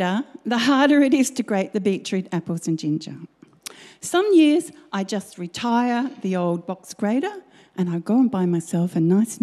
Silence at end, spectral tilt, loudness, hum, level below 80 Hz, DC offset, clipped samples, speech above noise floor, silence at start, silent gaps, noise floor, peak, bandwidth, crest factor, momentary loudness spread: 0.05 s; -5.5 dB/octave; -21 LUFS; none; -70 dBFS; under 0.1%; under 0.1%; 21 dB; 0 s; none; -42 dBFS; -6 dBFS; 13.5 kHz; 14 dB; 17 LU